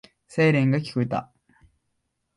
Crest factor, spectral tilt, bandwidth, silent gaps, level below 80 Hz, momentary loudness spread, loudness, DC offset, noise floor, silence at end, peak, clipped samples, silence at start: 16 dB; -7.5 dB/octave; 11 kHz; none; -62 dBFS; 11 LU; -23 LUFS; under 0.1%; -76 dBFS; 1.15 s; -10 dBFS; under 0.1%; 0.3 s